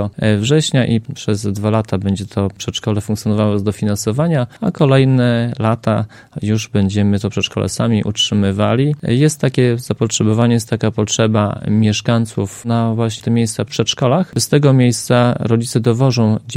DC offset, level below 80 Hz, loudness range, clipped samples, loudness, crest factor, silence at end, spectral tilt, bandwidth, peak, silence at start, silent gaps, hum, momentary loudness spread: under 0.1%; -48 dBFS; 3 LU; under 0.1%; -16 LUFS; 14 dB; 0 s; -5.5 dB/octave; 15 kHz; 0 dBFS; 0 s; none; none; 6 LU